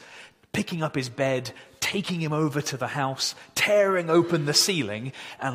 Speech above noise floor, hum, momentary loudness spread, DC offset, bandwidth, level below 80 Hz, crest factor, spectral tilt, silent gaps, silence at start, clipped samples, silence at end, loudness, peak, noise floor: 23 dB; none; 11 LU; under 0.1%; 16 kHz; -66 dBFS; 18 dB; -4 dB/octave; none; 0 s; under 0.1%; 0 s; -25 LUFS; -8 dBFS; -49 dBFS